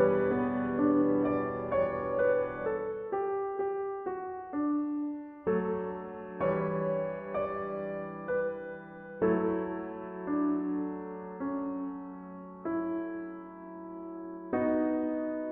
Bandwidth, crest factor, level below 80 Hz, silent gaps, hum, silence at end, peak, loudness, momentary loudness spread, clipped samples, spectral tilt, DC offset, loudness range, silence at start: 3.8 kHz; 18 dB; -62 dBFS; none; none; 0 s; -14 dBFS; -33 LUFS; 14 LU; under 0.1%; -8 dB/octave; under 0.1%; 6 LU; 0 s